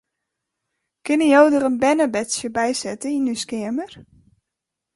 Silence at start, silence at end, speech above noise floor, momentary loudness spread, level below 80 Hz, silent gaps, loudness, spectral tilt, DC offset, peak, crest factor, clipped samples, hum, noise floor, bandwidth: 1.05 s; 0.95 s; 64 dB; 13 LU; -60 dBFS; none; -19 LUFS; -3.5 dB/octave; under 0.1%; -2 dBFS; 18 dB; under 0.1%; none; -83 dBFS; 11.5 kHz